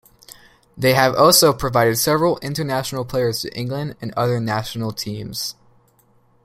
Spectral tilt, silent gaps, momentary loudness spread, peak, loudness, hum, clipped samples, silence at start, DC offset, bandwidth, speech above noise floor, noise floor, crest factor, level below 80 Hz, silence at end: -4 dB/octave; none; 14 LU; 0 dBFS; -19 LUFS; none; under 0.1%; 0.3 s; under 0.1%; 16 kHz; 38 dB; -57 dBFS; 20 dB; -48 dBFS; 0.95 s